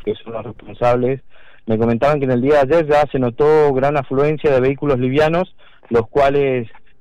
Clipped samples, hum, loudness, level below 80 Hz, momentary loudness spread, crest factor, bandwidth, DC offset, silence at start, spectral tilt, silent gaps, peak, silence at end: under 0.1%; none; -16 LUFS; -40 dBFS; 13 LU; 8 dB; 8.8 kHz; under 0.1%; 0 s; -8 dB/octave; none; -8 dBFS; 0.15 s